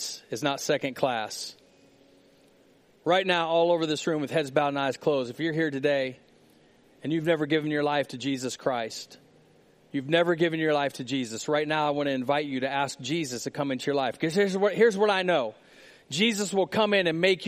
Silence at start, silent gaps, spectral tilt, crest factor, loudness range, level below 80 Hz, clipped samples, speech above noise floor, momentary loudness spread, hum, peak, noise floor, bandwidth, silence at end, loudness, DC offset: 0 s; none; -4.5 dB/octave; 20 dB; 4 LU; -74 dBFS; under 0.1%; 34 dB; 9 LU; none; -8 dBFS; -60 dBFS; 15 kHz; 0 s; -27 LUFS; under 0.1%